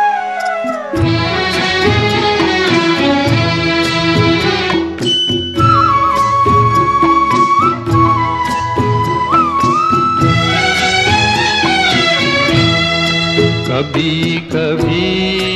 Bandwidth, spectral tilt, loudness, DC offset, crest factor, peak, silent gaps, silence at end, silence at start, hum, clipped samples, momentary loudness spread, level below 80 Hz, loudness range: 13 kHz; -5 dB/octave; -12 LUFS; under 0.1%; 12 dB; 0 dBFS; none; 0 s; 0 s; none; under 0.1%; 5 LU; -36 dBFS; 2 LU